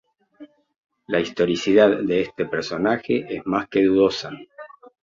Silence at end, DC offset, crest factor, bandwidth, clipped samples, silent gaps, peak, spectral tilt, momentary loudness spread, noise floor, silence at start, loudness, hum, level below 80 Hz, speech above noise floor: 0.35 s; under 0.1%; 20 dB; 7.6 kHz; under 0.1%; 0.76-0.89 s; -2 dBFS; -5.5 dB/octave; 11 LU; -47 dBFS; 0.4 s; -21 LUFS; none; -58 dBFS; 27 dB